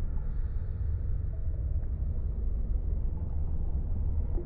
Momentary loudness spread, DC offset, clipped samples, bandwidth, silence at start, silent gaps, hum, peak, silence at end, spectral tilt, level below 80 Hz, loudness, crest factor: 3 LU; 0.3%; under 0.1%; 2 kHz; 0 s; none; none; -20 dBFS; 0 s; -12.5 dB/octave; -30 dBFS; -35 LUFS; 10 dB